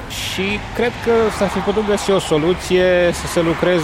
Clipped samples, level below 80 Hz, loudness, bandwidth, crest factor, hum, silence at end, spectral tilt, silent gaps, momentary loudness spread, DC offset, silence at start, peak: under 0.1%; -36 dBFS; -17 LUFS; 16.5 kHz; 14 dB; none; 0 s; -5 dB/octave; none; 6 LU; under 0.1%; 0 s; -4 dBFS